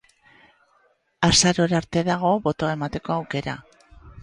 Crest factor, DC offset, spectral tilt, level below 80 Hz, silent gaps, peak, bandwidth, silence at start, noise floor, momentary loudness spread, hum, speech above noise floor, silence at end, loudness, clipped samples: 20 dB; under 0.1%; -4 dB/octave; -48 dBFS; none; -4 dBFS; 11.5 kHz; 1.2 s; -64 dBFS; 12 LU; none; 41 dB; 0 s; -22 LUFS; under 0.1%